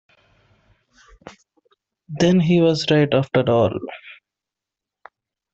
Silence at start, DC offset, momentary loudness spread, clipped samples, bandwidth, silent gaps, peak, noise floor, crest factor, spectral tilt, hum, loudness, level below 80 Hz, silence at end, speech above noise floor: 1.25 s; under 0.1%; 19 LU; under 0.1%; 8 kHz; none; -4 dBFS; -86 dBFS; 18 dB; -6.5 dB/octave; none; -18 LUFS; -56 dBFS; 1.4 s; 69 dB